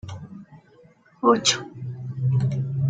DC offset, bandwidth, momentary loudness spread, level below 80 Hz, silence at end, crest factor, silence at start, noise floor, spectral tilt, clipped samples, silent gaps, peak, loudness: under 0.1%; 9.4 kHz; 21 LU; -56 dBFS; 0 s; 22 dB; 0.05 s; -54 dBFS; -4.5 dB/octave; under 0.1%; none; -4 dBFS; -23 LUFS